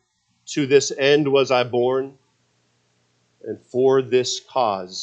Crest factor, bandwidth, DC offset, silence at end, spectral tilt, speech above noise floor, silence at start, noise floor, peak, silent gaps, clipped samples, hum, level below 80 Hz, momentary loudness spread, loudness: 18 dB; 8.4 kHz; under 0.1%; 0 s; -4 dB/octave; 46 dB; 0.5 s; -65 dBFS; -2 dBFS; none; under 0.1%; none; -72 dBFS; 15 LU; -20 LUFS